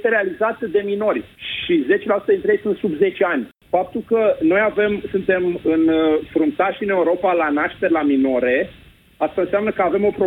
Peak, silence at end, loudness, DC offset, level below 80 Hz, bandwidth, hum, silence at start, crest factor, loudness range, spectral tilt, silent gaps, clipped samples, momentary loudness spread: -4 dBFS; 0 s; -19 LUFS; under 0.1%; -52 dBFS; 4.1 kHz; none; 0 s; 14 dB; 2 LU; -8 dB/octave; none; under 0.1%; 5 LU